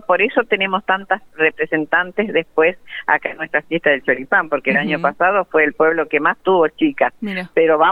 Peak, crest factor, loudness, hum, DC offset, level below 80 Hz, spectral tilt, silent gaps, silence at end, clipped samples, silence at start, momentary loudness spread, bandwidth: 0 dBFS; 16 dB; -17 LUFS; none; under 0.1%; -60 dBFS; -7 dB/octave; none; 0 s; under 0.1%; 0.1 s; 5 LU; 4.8 kHz